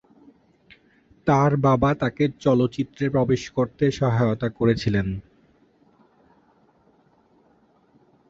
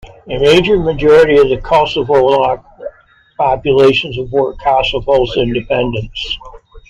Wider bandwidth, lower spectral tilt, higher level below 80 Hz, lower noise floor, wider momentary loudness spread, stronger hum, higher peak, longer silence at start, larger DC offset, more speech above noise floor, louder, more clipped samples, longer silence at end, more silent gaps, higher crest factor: second, 7.6 kHz vs 10.5 kHz; first, -7.5 dB/octave vs -6 dB/octave; second, -48 dBFS vs -32 dBFS; first, -60 dBFS vs -46 dBFS; second, 7 LU vs 12 LU; neither; second, -6 dBFS vs 0 dBFS; first, 1.25 s vs 0.05 s; neither; first, 39 dB vs 34 dB; second, -22 LUFS vs -12 LUFS; neither; first, 3.1 s vs 0.1 s; neither; first, 18 dB vs 12 dB